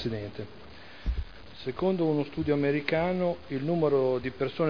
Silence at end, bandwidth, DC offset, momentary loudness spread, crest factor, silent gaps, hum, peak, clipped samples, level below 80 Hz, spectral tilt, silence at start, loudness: 0 s; 5.4 kHz; 0.4%; 16 LU; 18 dB; none; none; -10 dBFS; under 0.1%; -44 dBFS; -8.5 dB/octave; 0 s; -29 LUFS